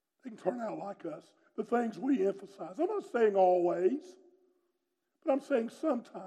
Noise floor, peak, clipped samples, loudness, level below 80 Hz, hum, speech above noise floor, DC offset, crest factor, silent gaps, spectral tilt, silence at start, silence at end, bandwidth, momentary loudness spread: -83 dBFS; -16 dBFS; under 0.1%; -32 LUFS; -90 dBFS; none; 51 dB; under 0.1%; 16 dB; none; -7 dB/octave; 0.25 s; 0 s; 10.5 kHz; 17 LU